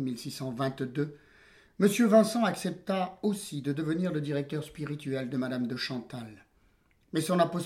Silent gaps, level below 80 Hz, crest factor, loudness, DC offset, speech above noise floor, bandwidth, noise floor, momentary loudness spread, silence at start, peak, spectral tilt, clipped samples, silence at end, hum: none; -68 dBFS; 22 dB; -30 LUFS; under 0.1%; 37 dB; 16 kHz; -66 dBFS; 14 LU; 0 s; -10 dBFS; -6 dB/octave; under 0.1%; 0 s; none